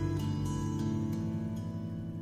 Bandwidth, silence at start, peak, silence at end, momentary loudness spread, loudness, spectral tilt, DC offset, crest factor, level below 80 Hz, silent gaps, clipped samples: 15 kHz; 0 s; -22 dBFS; 0 s; 5 LU; -35 LUFS; -7.5 dB/octave; under 0.1%; 12 dB; -50 dBFS; none; under 0.1%